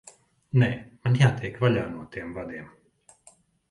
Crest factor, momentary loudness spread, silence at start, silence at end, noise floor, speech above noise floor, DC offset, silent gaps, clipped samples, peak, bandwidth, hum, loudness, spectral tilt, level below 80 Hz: 20 dB; 15 LU; 0.55 s; 1.05 s; -59 dBFS; 34 dB; under 0.1%; none; under 0.1%; -8 dBFS; 11 kHz; none; -26 LUFS; -7 dB/octave; -56 dBFS